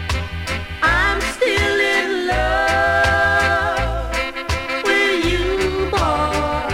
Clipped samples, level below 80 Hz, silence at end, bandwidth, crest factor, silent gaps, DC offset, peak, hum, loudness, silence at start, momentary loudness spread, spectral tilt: under 0.1%; -28 dBFS; 0 s; 16.5 kHz; 14 dB; none; under 0.1%; -4 dBFS; none; -18 LUFS; 0 s; 7 LU; -4.5 dB/octave